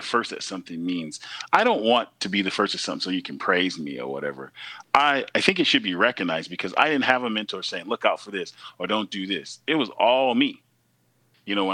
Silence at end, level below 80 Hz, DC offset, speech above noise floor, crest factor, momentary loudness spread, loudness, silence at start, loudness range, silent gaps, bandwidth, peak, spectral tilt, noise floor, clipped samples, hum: 0 s; -72 dBFS; under 0.1%; 42 dB; 22 dB; 13 LU; -24 LUFS; 0 s; 3 LU; none; 12 kHz; -2 dBFS; -3.5 dB/octave; -66 dBFS; under 0.1%; none